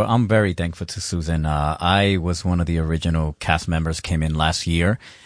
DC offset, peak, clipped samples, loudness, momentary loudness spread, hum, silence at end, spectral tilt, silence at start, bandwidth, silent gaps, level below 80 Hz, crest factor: under 0.1%; -2 dBFS; under 0.1%; -21 LUFS; 6 LU; none; 0.15 s; -5.5 dB/octave; 0 s; 10.5 kHz; none; -32 dBFS; 20 dB